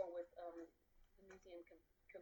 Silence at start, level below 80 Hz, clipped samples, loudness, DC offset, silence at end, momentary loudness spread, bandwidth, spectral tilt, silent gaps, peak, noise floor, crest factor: 0 s; -78 dBFS; under 0.1%; -56 LUFS; under 0.1%; 0 s; 14 LU; 19 kHz; -5.5 dB/octave; none; -34 dBFS; -73 dBFS; 20 dB